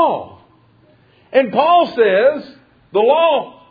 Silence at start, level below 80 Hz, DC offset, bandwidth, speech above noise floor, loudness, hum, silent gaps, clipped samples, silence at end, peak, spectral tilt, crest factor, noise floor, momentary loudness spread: 0 s; -62 dBFS; under 0.1%; 5 kHz; 38 dB; -15 LUFS; none; none; under 0.1%; 0.2 s; 0 dBFS; -7 dB/octave; 16 dB; -51 dBFS; 9 LU